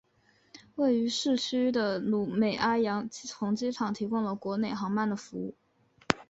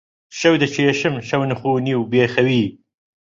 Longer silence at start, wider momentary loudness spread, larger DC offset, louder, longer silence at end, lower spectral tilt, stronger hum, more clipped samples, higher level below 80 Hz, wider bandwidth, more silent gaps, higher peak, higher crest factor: first, 0.55 s vs 0.3 s; first, 9 LU vs 5 LU; neither; second, -30 LUFS vs -18 LUFS; second, 0.05 s vs 0.5 s; about the same, -5 dB/octave vs -5.5 dB/octave; neither; neither; second, -66 dBFS vs -56 dBFS; about the same, 8 kHz vs 7.8 kHz; neither; about the same, -2 dBFS vs -2 dBFS; first, 28 dB vs 16 dB